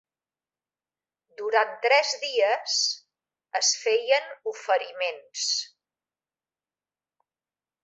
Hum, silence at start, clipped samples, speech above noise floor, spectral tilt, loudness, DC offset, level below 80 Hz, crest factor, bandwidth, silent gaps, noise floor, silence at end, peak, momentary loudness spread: none; 1.4 s; under 0.1%; over 65 dB; 3 dB/octave; -25 LUFS; under 0.1%; -88 dBFS; 22 dB; 8.4 kHz; none; under -90 dBFS; 2.15 s; -6 dBFS; 12 LU